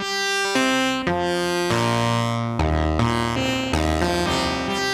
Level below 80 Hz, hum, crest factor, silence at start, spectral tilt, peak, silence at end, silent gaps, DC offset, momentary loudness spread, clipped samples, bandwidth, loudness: -34 dBFS; none; 18 dB; 0 s; -4.5 dB/octave; -4 dBFS; 0 s; none; 0.1%; 3 LU; under 0.1%; 16 kHz; -21 LUFS